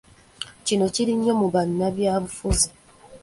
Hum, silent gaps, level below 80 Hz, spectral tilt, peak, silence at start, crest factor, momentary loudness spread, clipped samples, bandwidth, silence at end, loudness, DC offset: none; none; -38 dBFS; -4.5 dB/octave; -4 dBFS; 0.4 s; 20 dB; 7 LU; under 0.1%; 12 kHz; 0.05 s; -23 LUFS; under 0.1%